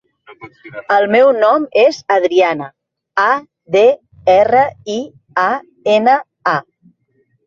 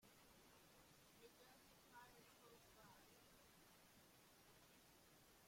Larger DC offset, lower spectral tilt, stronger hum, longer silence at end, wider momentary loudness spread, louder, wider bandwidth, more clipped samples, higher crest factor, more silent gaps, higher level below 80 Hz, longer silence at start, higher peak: neither; first, -5 dB/octave vs -3 dB/octave; neither; first, 0.85 s vs 0 s; first, 13 LU vs 3 LU; first, -14 LUFS vs -69 LUFS; second, 7.4 kHz vs 16.5 kHz; neither; about the same, 14 dB vs 18 dB; neither; first, -58 dBFS vs -84 dBFS; first, 0.3 s vs 0 s; first, 0 dBFS vs -52 dBFS